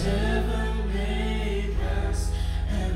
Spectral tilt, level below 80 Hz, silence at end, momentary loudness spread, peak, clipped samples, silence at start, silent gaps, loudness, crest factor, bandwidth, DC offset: -6 dB/octave; -26 dBFS; 0 s; 3 LU; -12 dBFS; under 0.1%; 0 s; none; -28 LUFS; 12 dB; 11.5 kHz; under 0.1%